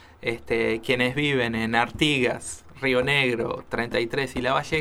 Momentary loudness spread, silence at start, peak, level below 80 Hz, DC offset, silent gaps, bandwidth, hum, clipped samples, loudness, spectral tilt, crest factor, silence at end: 8 LU; 0.2 s; -4 dBFS; -48 dBFS; under 0.1%; none; 16 kHz; none; under 0.1%; -24 LUFS; -4.5 dB/octave; 20 dB; 0 s